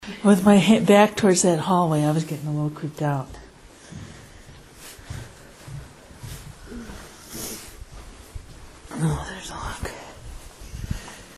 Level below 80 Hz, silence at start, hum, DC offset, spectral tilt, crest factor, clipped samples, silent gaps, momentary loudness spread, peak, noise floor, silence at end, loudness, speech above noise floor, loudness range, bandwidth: -44 dBFS; 0 s; none; under 0.1%; -5.5 dB/octave; 20 dB; under 0.1%; none; 27 LU; -4 dBFS; -46 dBFS; 0.05 s; -21 LUFS; 27 dB; 21 LU; 13.5 kHz